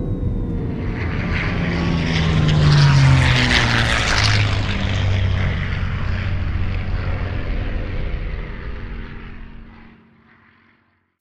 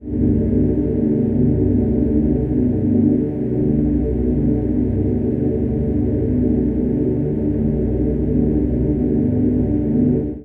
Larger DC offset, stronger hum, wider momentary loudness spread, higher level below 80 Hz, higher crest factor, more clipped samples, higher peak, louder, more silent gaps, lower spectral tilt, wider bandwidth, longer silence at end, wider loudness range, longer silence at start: neither; neither; first, 18 LU vs 3 LU; about the same, -26 dBFS vs -28 dBFS; first, 18 dB vs 12 dB; neither; first, 0 dBFS vs -4 dBFS; about the same, -19 LUFS vs -18 LUFS; neither; second, -5.5 dB/octave vs -13.5 dB/octave; first, 10.5 kHz vs 2.8 kHz; first, 1.3 s vs 0 s; first, 15 LU vs 2 LU; about the same, 0 s vs 0 s